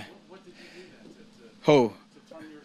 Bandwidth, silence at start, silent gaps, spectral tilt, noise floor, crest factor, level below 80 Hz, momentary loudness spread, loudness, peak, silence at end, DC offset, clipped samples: 11.5 kHz; 0 s; none; -6.5 dB/octave; -52 dBFS; 24 dB; -70 dBFS; 27 LU; -24 LUFS; -6 dBFS; 0.25 s; under 0.1%; under 0.1%